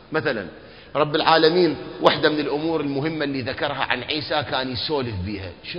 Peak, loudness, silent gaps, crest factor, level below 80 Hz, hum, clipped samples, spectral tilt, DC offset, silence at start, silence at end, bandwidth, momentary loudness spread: 0 dBFS; -22 LUFS; none; 22 dB; -48 dBFS; none; under 0.1%; -7.5 dB/octave; 0.1%; 0 s; 0 s; 6.8 kHz; 12 LU